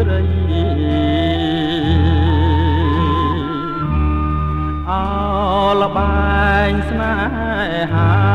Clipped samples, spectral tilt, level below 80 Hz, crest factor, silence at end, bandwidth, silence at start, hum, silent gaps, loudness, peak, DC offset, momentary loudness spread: under 0.1%; -8.5 dB/octave; -22 dBFS; 12 dB; 0 s; 5 kHz; 0 s; none; none; -16 LUFS; -2 dBFS; under 0.1%; 5 LU